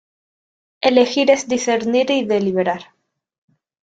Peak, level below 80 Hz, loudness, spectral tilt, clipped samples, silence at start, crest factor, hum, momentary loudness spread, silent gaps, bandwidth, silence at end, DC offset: -2 dBFS; -64 dBFS; -17 LUFS; -4 dB/octave; under 0.1%; 0.85 s; 18 dB; none; 6 LU; none; 9 kHz; 1 s; under 0.1%